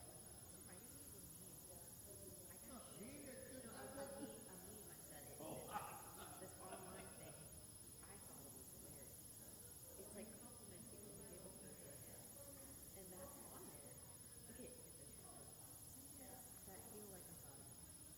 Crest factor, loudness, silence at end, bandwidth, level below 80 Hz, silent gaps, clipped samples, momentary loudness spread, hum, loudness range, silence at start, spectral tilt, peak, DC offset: 24 dB; -56 LUFS; 0 s; 16 kHz; -72 dBFS; none; under 0.1%; 4 LU; none; 3 LU; 0 s; -3.5 dB/octave; -34 dBFS; under 0.1%